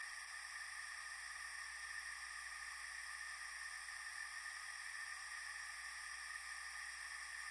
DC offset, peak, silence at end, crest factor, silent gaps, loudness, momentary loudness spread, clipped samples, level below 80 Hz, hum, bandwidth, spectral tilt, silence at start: under 0.1%; -38 dBFS; 0 s; 14 dB; none; -48 LUFS; 1 LU; under 0.1%; -76 dBFS; none; 11.5 kHz; 2.5 dB/octave; 0 s